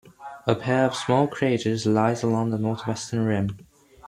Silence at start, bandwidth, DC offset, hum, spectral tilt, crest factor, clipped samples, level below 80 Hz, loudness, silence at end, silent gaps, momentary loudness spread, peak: 0.2 s; 12.5 kHz; under 0.1%; none; -6 dB/octave; 20 dB; under 0.1%; -58 dBFS; -24 LUFS; 0.5 s; none; 8 LU; -4 dBFS